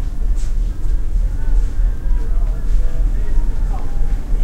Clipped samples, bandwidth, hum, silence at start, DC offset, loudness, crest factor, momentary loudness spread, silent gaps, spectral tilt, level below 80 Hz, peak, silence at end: under 0.1%; 2.8 kHz; none; 0 s; under 0.1%; -23 LUFS; 12 dB; 3 LU; none; -7 dB/octave; -14 dBFS; -2 dBFS; 0 s